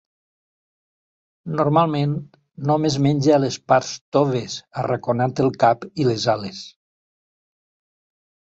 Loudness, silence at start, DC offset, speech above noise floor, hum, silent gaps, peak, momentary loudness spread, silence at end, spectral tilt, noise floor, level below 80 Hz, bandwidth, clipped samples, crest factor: -20 LUFS; 1.45 s; under 0.1%; over 70 dB; none; 4.01-4.12 s; -2 dBFS; 12 LU; 1.75 s; -6 dB/octave; under -90 dBFS; -58 dBFS; 8 kHz; under 0.1%; 20 dB